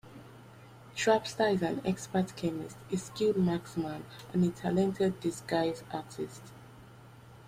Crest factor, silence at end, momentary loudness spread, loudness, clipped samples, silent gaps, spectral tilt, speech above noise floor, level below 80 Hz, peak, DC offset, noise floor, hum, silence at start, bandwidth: 20 dB; 0 s; 22 LU; -32 LUFS; under 0.1%; none; -6 dB/octave; 21 dB; -64 dBFS; -12 dBFS; under 0.1%; -53 dBFS; none; 0.05 s; 15.5 kHz